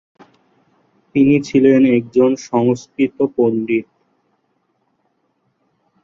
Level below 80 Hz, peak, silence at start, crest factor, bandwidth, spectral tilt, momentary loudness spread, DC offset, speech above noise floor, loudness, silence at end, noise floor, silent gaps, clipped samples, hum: -58 dBFS; -2 dBFS; 1.15 s; 16 dB; 7.4 kHz; -7 dB/octave; 9 LU; under 0.1%; 51 dB; -15 LUFS; 2.2 s; -66 dBFS; none; under 0.1%; none